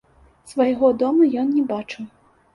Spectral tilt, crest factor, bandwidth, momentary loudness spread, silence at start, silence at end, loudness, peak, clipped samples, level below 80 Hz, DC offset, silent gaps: -6.5 dB/octave; 16 dB; 11.5 kHz; 17 LU; 0.45 s; 0.45 s; -19 LUFS; -4 dBFS; under 0.1%; -60 dBFS; under 0.1%; none